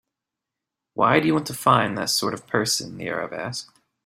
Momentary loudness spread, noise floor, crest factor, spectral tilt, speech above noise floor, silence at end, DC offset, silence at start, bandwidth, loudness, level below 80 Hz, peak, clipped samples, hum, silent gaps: 12 LU; -86 dBFS; 22 dB; -3.5 dB/octave; 63 dB; 0.4 s; under 0.1%; 0.95 s; 16 kHz; -22 LUFS; -60 dBFS; -2 dBFS; under 0.1%; none; none